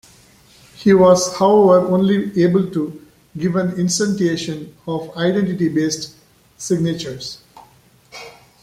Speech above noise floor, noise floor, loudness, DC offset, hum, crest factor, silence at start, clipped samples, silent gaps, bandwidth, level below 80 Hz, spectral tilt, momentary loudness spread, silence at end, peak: 34 dB; -51 dBFS; -17 LUFS; under 0.1%; none; 16 dB; 0.8 s; under 0.1%; none; 15 kHz; -54 dBFS; -5.5 dB/octave; 19 LU; 0.3 s; -2 dBFS